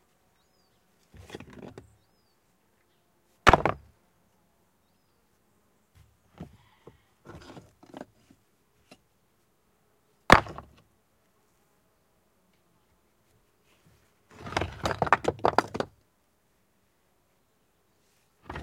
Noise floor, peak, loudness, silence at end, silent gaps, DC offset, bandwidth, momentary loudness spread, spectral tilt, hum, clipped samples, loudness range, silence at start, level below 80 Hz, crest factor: -70 dBFS; 0 dBFS; -25 LUFS; 0 s; none; under 0.1%; 16 kHz; 29 LU; -4.5 dB/octave; none; under 0.1%; 22 LU; 1.3 s; -48 dBFS; 32 dB